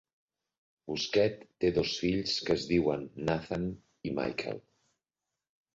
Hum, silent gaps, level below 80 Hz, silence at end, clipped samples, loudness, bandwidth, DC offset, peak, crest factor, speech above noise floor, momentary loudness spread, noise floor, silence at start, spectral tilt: none; none; -56 dBFS; 1.15 s; under 0.1%; -32 LUFS; 7.8 kHz; under 0.1%; -14 dBFS; 18 dB; 59 dB; 10 LU; -90 dBFS; 0.85 s; -5.5 dB/octave